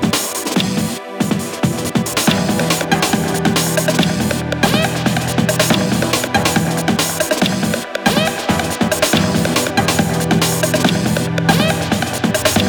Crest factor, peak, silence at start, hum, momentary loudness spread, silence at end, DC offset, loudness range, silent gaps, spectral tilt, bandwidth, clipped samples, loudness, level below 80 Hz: 16 dB; 0 dBFS; 0 s; none; 4 LU; 0 s; under 0.1%; 1 LU; none; -4 dB/octave; over 20 kHz; under 0.1%; -16 LUFS; -40 dBFS